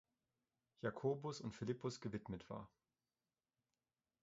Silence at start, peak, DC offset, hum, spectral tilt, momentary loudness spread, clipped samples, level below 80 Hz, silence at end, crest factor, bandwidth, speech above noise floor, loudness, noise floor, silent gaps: 0.85 s; -28 dBFS; under 0.1%; none; -6 dB/octave; 11 LU; under 0.1%; -74 dBFS; 1.55 s; 22 dB; 7.6 kHz; over 44 dB; -47 LUFS; under -90 dBFS; none